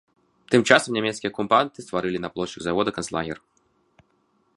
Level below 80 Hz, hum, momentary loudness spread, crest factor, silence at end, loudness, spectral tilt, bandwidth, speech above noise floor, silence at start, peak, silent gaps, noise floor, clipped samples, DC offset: -58 dBFS; none; 12 LU; 24 dB; 1.2 s; -23 LUFS; -4 dB/octave; 11.5 kHz; 44 dB; 0.5 s; 0 dBFS; none; -67 dBFS; under 0.1%; under 0.1%